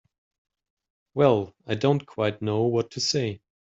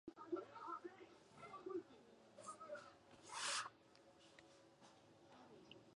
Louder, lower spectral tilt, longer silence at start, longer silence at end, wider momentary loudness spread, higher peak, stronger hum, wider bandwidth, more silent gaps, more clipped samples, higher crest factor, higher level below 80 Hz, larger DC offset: first, -25 LUFS vs -51 LUFS; first, -5.5 dB/octave vs -1.5 dB/octave; first, 1.15 s vs 0.05 s; first, 0.35 s vs 0 s; second, 10 LU vs 21 LU; first, -6 dBFS vs -32 dBFS; neither; second, 8 kHz vs 11 kHz; neither; neither; about the same, 22 dB vs 22 dB; first, -64 dBFS vs -90 dBFS; neither